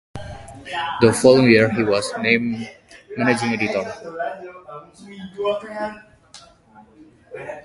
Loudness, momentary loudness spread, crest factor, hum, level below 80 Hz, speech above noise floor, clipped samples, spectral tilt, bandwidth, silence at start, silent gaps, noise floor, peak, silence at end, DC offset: -19 LUFS; 24 LU; 22 dB; none; -52 dBFS; 30 dB; under 0.1%; -5 dB/octave; 11.5 kHz; 0.15 s; none; -49 dBFS; 0 dBFS; 0.05 s; under 0.1%